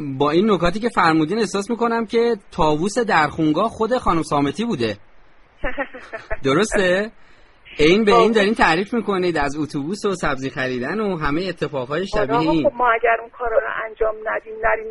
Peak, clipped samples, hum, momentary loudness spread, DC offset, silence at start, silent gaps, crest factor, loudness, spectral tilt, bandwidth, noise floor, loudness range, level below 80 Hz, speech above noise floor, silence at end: -2 dBFS; under 0.1%; none; 10 LU; under 0.1%; 0 s; none; 18 dB; -19 LUFS; -5.5 dB/octave; 11.5 kHz; -47 dBFS; 5 LU; -38 dBFS; 28 dB; 0 s